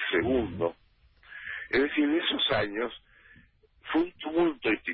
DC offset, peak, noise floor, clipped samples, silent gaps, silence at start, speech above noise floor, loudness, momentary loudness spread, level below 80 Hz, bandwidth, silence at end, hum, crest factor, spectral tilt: under 0.1%; -14 dBFS; -60 dBFS; under 0.1%; none; 0 s; 32 dB; -28 LUFS; 14 LU; -54 dBFS; 5.4 kHz; 0 s; none; 16 dB; -9 dB/octave